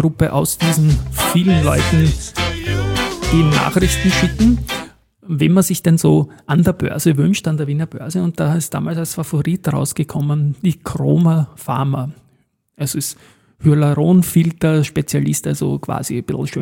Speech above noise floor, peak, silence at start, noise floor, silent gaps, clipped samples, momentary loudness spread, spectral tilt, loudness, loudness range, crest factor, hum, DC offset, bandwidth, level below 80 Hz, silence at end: 44 dB; -2 dBFS; 0 s; -59 dBFS; none; under 0.1%; 8 LU; -5.5 dB/octave; -16 LUFS; 4 LU; 14 dB; none; under 0.1%; 17 kHz; -32 dBFS; 0 s